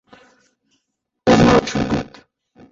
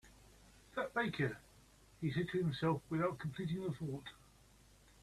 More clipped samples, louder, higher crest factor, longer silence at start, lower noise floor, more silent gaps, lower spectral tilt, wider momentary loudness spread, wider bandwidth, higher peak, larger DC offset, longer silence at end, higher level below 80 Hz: neither; first, -16 LUFS vs -40 LUFS; about the same, 18 dB vs 18 dB; first, 1.25 s vs 0.05 s; first, -74 dBFS vs -65 dBFS; neither; about the same, -6 dB/octave vs -7 dB/octave; about the same, 12 LU vs 10 LU; second, 7.8 kHz vs 13.5 kHz; first, -2 dBFS vs -24 dBFS; neither; second, 0.7 s vs 0.85 s; first, -40 dBFS vs -66 dBFS